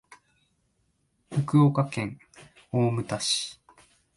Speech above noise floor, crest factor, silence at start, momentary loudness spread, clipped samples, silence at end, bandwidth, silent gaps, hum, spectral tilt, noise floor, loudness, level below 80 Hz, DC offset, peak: 47 dB; 18 dB; 1.3 s; 14 LU; under 0.1%; 0.65 s; 11.5 kHz; none; none; -5.5 dB/octave; -72 dBFS; -26 LUFS; -64 dBFS; under 0.1%; -10 dBFS